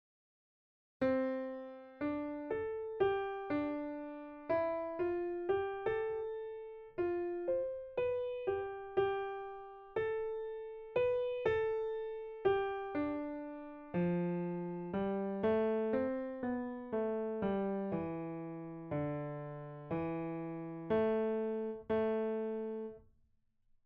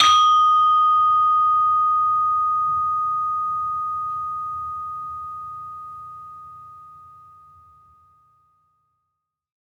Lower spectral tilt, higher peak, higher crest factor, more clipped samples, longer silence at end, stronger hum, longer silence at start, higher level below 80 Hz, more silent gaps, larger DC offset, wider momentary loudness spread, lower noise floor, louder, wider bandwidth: first, -6.5 dB/octave vs 0 dB/octave; second, -20 dBFS vs -2 dBFS; about the same, 18 dB vs 20 dB; neither; second, 0.85 s vs 2.65 s; neither; first, 1 s vs 0 s; about the same, -66 dBFS vs -64 dBFS; neither; neither; second, 10 LU vs 21 LU; second, -73 dBFS vs -79 dBFS; second, -38 LUFS vs -19 LUFS; second, 5.2 kHz vs 10 kHz